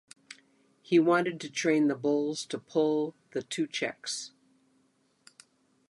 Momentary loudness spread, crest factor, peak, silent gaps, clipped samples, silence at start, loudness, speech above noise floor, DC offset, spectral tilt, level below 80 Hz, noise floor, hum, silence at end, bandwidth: 20 LU; 20 dB; -12 dBFS; none; under 0.1%; 0.9 s; -29 LUFS; 41 dB; under 0.1%; -4.5 dB/octave; -82 dBFS; -70 dBFS; none; 1.6 s; 11.5 kHz